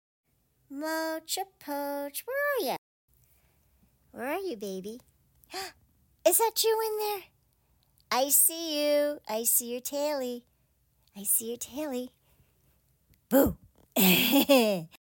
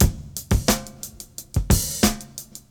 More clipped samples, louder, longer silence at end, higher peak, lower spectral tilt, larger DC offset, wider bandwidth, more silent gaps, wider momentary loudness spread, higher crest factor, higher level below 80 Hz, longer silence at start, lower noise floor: neither; second, -27 LUFS vs -22 LUFS; about the same, 0.2 s vs 0.1 s; second, -8 dBFS vs 0 dBFS; about the same, -3 dB/octave vs -4 dB/octave; neither; second, 17 kHz vs over 20 kHz; first, 2.78-3.08 s vs none; about the same, 18 LU vs 16 LU; about the same, 22 dB vs 22 dB; second, -60 dBFS vs -28 dBFS; first, 0.7 s vs 0 s; first, -70 dBFS vs -40 dBFS